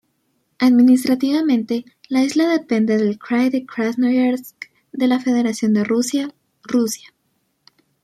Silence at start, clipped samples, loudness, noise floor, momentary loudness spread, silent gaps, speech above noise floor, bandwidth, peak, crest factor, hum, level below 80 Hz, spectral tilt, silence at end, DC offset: 0.6 s; under 0.1%; -18 LUFS; -68 dBFS; 11 LU; none; 51 dB; 14 kHz; -4 dBFS; 14 dB; none; -68 dBFS; -5 dB/octave; 1.05 s; under 0.1%